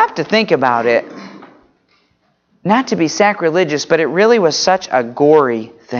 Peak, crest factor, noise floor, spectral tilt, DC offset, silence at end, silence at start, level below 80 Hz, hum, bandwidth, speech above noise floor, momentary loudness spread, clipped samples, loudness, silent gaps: 0 dBFS; 14 dB; -60 dBFS; -4.5 dB/octave; under 0.1%; 0 s; 0 s; -62 dBFS; none; 7.4 kHz; 47 dB; 7 LU; under 0.1%; -14 LUFS; none